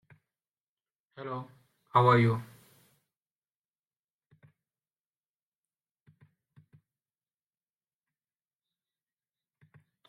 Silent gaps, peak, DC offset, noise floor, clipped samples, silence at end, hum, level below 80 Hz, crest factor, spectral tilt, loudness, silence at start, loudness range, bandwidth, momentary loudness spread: none; -10 dBFS; under 0.1%; under -90 dBFS; under 0.1%; 7.65 s; none; -72 dBFS; 26 dB; -8 dB/octave; -27 LUFS; 1.2 s; 2 LU; 11 kHz; 26 LU